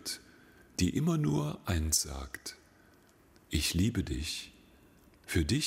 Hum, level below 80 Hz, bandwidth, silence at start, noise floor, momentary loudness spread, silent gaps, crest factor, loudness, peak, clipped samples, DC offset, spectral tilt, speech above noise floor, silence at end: none; -44 dBFS; 16 kHz; 0 s; -62 dBFS; 14 LU; none; 18 dB; -33 LUFS; -16 dBFS; under 0.1%; under 0.1%; -4 dB/octave; 31 dB; 0 s